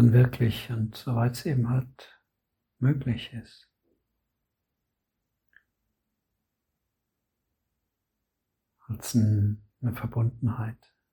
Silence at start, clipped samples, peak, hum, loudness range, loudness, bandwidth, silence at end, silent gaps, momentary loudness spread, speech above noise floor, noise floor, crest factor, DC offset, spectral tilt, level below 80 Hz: 0 s; under 0.1%; -8 dBFS; none; 9 LU; -28 LUFS; 17.5 kHz; 0.4 s; none; 13 LU; 57 dB; -83 dBFS; 22 dB; under 0.1%; -7.5 dB/octave; -56 dBFS